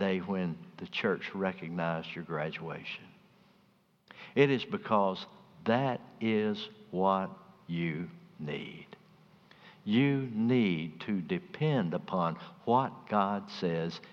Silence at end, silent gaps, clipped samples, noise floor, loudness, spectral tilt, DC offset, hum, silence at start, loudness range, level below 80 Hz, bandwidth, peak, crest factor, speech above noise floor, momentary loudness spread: 0 s; none; under 0.1%; -67 dBFS; -32 LUFS; -8 dB/octave; under 0.1%; none; 0 s; 5 LU; -74 dBFS; 7 kHz; -10 dBFS; 22 dB; 36 dB; 13 LU